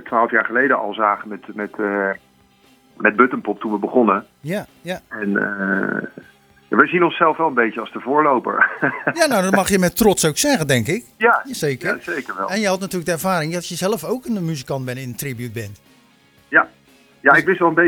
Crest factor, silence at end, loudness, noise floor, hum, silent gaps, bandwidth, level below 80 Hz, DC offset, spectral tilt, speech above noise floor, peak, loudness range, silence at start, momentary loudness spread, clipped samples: 20 dB; 0 s; -18 LUFS; -54 dBFS; none; none; over 20 kHz; -52 dBFS; under 0.1%; -4.5 dB/octave; 35 dB; 0 dBFS; 6 LU; 0 s; 12 LU; under 0.1%